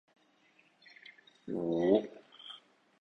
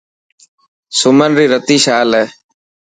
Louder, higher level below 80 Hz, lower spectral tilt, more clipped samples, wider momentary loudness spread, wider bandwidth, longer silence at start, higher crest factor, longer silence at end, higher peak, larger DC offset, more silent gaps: second, -32 LUFS vs -11 LUFS; second, -74 dBFS vs -58 dBFS; first, -7.5 dB/octave vs -3.5 dB/octave; neither; first, 25 LU vs 7 LU; second, 6.2 kHz vs 9.6 kHz; first, 1.45 s vs 0.9 s; first, 22 dB vs 14 dB; about the same, 0.45 s vs 0.55 s; second, -14 dBFS vs 0 dBFS; neither; neither